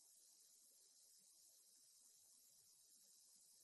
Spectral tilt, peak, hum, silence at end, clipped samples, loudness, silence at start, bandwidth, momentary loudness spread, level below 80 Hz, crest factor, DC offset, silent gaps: 1.5 dB/octave; -54 dBFS; none; 0 s; under 0.1%; -68 LUFS; 0 s; 12 kHz; 1 LU; under -90 dBFS; 18 dB; under 0.1%; none